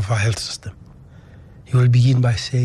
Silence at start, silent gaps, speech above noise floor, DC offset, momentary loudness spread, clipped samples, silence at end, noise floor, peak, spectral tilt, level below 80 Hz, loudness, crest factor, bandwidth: 0 s; none; 26 dB; under 0.1%; 15 LU; under 0.1%; 0 s; -43 dBFS; -6 dBFS; -6 dB/octave; -46 dBFS; -18 LUFS; 12 dB; 11 kHz